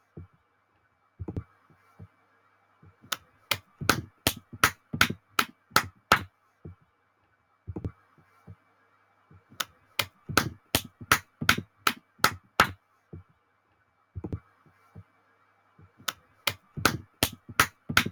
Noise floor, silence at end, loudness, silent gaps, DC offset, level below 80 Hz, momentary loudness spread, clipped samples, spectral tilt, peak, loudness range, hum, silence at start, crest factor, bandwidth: -69 dBFS; 0 s; -29 LUFS; none; under 0.1%; -56 dBFS; 20 LU; under 0.1%; -2.5 dB/octave; -4 dBFS; 16 LU; none; 0.15 s; 28 dB; over 20 kHz